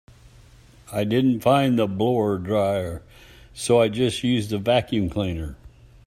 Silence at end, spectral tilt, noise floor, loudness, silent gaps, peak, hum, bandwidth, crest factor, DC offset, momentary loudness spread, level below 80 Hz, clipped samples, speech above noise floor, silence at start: 0.4 s; -6 dB/octave; -50 dBFS; -22 LUFS; none; -6 dBFS; none; 15 kHz; 18 dB; under 0.1%; 13 LU; -48 dBFS; under 0.1%; 28 dB; 0.9 s